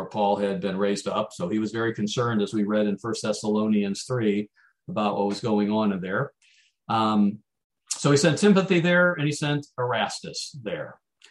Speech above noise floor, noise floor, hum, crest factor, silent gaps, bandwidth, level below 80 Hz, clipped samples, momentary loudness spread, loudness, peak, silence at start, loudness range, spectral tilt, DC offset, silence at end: 38 dB; -62 dBFS; none; 18 dB; 7.64-7.70 s; 12 kHz; -68 dBFS; under 0.1%; 12 LU; -25 LUFS; -8 dBFS; 0 s; 4 LU; -5.5 dB/octave; under 0.1%; 0.35 s